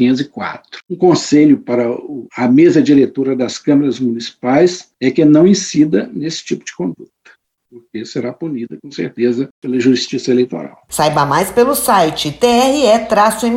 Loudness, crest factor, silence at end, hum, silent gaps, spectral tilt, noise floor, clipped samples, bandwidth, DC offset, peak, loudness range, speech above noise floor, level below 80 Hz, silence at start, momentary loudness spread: -14 LUFS; 14 dB; 0 s; none; 9.51-9.62 s; -5 dB/octave; -49 dBFS; under 0.1%; 16.5 kHz; under 0.1%; 0 dBFS; 8 LU; 36 dB; -50 dBFS; 0 s; 14 LU